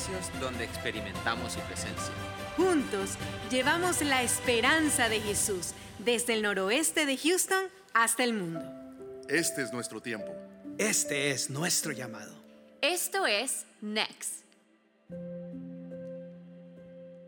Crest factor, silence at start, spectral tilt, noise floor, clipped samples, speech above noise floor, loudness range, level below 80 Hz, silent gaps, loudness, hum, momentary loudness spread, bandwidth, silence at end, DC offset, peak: 22 dB; 0 s; -2.5 dB/octave; -66 dBFS; under 0.1%; 35 dB; 5 LU; -60 dBFS; none; -29 LUFS; none; 17 LU; 19 kHz; 0 s; under 0.1%; -10 dBFS